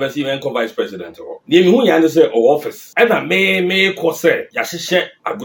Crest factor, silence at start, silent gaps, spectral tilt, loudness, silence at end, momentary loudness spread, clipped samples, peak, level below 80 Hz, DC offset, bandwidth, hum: 16 dB; 0 s; none; -4.5 dB/octave; -15 LUFS; 0 s; 12 LU; under 0.1%; 0 dBFS; -64 dBFS; under 0.1%; 17 kHz; none